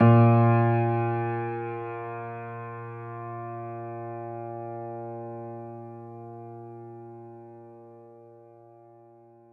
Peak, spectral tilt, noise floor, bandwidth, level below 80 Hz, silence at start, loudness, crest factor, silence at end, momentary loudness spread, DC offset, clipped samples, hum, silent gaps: -8 dBFS; -12 dB/octave; -54 dBFS; 3.5 kHz; -72 dBFS; 0 s; -28 LUFS; 20 dB; 1.1 s; 24 LU; under 0.1%; under 0.1%; none; none